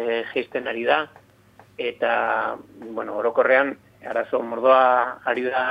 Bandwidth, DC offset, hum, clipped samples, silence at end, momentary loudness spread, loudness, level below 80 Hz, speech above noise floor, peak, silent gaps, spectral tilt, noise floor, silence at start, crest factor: 5.2 kHz; under 0.1%; none; under 0.1%; 0 s; 13 LU; -22 LUFS; -70 dBFS; 31 dB; -4 dBFS; none; -5.5 dB/octave; -53 dBFS; 0 s; 18 dB